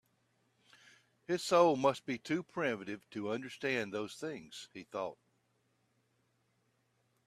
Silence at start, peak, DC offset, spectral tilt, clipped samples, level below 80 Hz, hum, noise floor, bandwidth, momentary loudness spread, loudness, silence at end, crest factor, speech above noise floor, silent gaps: 1.3 s; -14 dBFS; under 0.1%; -4.5 dB/octave; under 0.1%; -80 dBFS; none; -77 dBFS; 14 kHz; 16 LU; -35 LUFS; 2.15 s; 24 dB; 42 dB; none